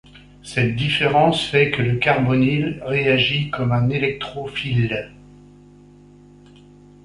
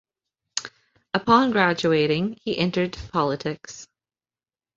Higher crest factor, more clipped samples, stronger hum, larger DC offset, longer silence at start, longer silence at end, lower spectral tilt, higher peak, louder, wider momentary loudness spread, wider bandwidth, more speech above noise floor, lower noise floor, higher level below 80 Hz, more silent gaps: about the same, 18 dB vs 22 dB; neither; first, 50 Hz at -40 dBFS vs none; neither; second, 0.15 s vs 0.55 s; first, 1.95 s vs 0.9 s; first, -6.5 dB/octave vs -5 dB/octave; about the same, -2 dBFS vs -2 dBFS; first, -19 LUFS vs -23 LUFS; second, 10 LU vs 16 LU; first, 11.5 kHz vs 8 kHz; second, 27 dB vs over 68 dB; second, -46 dBFS vs under -90 dBFS; first, -48 dBFS vs -54 dBFS; neither